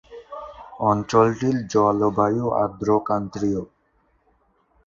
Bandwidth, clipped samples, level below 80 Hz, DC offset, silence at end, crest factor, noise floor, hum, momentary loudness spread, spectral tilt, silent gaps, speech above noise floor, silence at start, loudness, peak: 7.6 kHz; under 0.1%; -52 dBFS; under 0.1%; 1.2 s; 20 dB; -65 dBFS; none; 19 LU; -7 dB/octave; none; 44 dB; 0.1 s; -21 LUFS; -2 dBFS